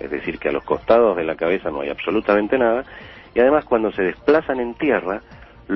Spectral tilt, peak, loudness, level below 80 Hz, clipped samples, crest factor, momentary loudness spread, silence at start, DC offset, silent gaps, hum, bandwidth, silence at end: -8.5 dB/octave; -2 dBFS; -19 LUFS; -48 dBFS; under 0.1%; 18 dB; 10 LU; 0 s; under 0.1%; none; none; 6 kHz; 0 s